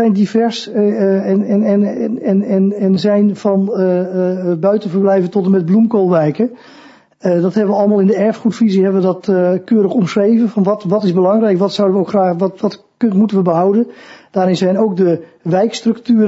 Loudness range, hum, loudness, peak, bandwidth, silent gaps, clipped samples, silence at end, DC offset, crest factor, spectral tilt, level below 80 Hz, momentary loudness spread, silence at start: 1 LU; none; -14 LUFS; 0 dBFS; 8 kHz; none; under 0.1%; 0 s; under 0.1%; 12 dB; -8 dB/octave; -64 dBFS; 5 LU; 0 s